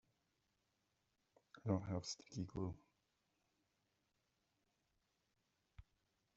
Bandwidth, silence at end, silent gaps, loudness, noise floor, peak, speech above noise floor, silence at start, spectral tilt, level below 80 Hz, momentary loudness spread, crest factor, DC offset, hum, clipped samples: 7.6 kHz; 0.55 s; none; -46 LUFS; -86 dBFS; -26 dBFS; 41 dB; 1.55 s; -7 dB/octave; -74 dBFS; 14 LU; 26 dB; under 0.1%; none; under 0.1%